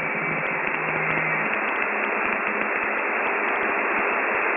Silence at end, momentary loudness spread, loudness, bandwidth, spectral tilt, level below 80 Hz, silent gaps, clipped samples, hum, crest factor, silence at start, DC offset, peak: 0 s; 2 LU; -23 LUFS; 3.7 kHz; -3 dB/octave; -64 dBFS; none; under 0.1%; none; 18 dB; 0 s; under 0.1%; -6 dBFS